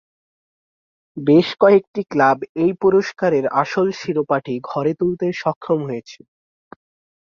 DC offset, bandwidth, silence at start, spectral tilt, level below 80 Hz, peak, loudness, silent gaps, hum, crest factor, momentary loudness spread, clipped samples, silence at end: under 0.1%; 7.2 kHz; 1.15 s; -7 dB/octave; -60 dBFS; -2 dBFS; -18 LUFS; 1.87-1.94 s, 2.49-2.55 s, 5.56-5.61 s; none; 18 dB; 10 LU; under 0.1%; 1.05 s